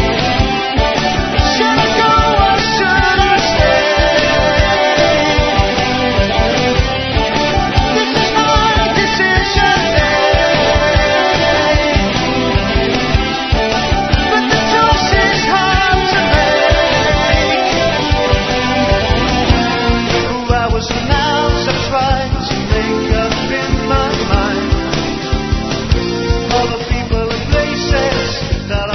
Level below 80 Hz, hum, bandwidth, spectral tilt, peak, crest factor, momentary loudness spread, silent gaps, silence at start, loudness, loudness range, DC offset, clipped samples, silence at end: -22 dBFS; none; 6.4 kHz; -4.5 dB/octave; 0 dBFS; 12 dB; 5 LU; none; 0 s; -13 LUFS; 4 LU; under 0.1%; under 0.1%; 0 s